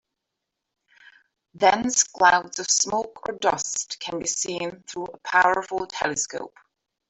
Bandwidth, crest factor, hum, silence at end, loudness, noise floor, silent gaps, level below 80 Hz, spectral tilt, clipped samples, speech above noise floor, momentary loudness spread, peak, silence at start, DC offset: 8.4 kHz; 22 dB; none; 0.6 s; -23 LUFS; -83 dBFS; none; -62 dBFS; -1 dB/octave; under 0.1%; 59 dB; 14 LU; -4 dBFS; 1.55 s; under 0.1%